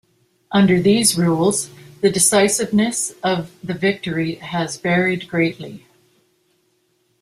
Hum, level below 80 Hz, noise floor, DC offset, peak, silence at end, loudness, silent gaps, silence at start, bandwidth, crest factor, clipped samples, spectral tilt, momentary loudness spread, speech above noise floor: none; -56 dBFS; -64 dBFS; under 0.1%; 0 dBFS; 1.45 s; -18 LUFS; none; 0.5 s; 15.5 kHz; 18 dB; under 0.1%; -4 dB/octave; 10 LU; 46 dB